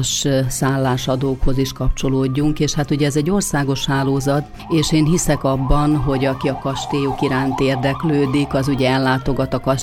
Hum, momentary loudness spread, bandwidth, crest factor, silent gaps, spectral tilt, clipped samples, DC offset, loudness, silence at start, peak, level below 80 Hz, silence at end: none; 4 LU; 16 kHz; 14 dB; none; -5.5 dB/octave; under 0.1%; under 0.1%; -18 LUFS; 0 s; -2 dBFS; -28 dBFS; 0 s